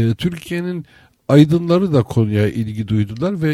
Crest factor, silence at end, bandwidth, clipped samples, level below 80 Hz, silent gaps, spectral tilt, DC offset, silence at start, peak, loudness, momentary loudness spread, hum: 16 dB; 0 s; 13.5 kHz; under 0.1%; -46 dBFS; none; -8 dB/octave; under 0.1%; 0 s; 0 dBFS; -17 LUFS; 12 LU; none